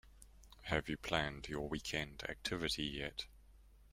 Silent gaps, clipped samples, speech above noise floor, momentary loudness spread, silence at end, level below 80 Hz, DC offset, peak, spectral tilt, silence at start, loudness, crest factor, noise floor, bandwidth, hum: none; under 0.1%; 22 dB; 10 LU; 0.05 s; -56 dBFS; under 0.1%; -18 dBFS; -4 dB/octave; 0.05 s; -41 LUFS; 26 dB; -63 dBFS; 16.5 kHz; none